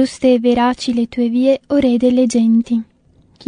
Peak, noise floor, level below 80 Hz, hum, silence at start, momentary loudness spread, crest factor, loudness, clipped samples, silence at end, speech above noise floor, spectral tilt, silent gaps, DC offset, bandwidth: -2 dBFS; -49 dBFS; -48 dBFS; none; 0 s; 5 LU; 12 dB; -15 LUFS; under 0.1%; 0.65 s; 35 dB; -5.5 dB/octave; none; under 0.1%; 10.5 kHz